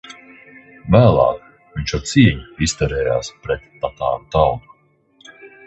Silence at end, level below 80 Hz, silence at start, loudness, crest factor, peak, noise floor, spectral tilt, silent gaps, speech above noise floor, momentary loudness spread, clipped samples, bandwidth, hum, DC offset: 0.2 s; -34 dBFS; 0.1 s; -18 LUFS; 18 dB; 0 dBFS; -56 dBFS; -6 dB/octave; none; 39 dB; 17 LU; under 0.1%; 8.4 kHz; none; under 0.1%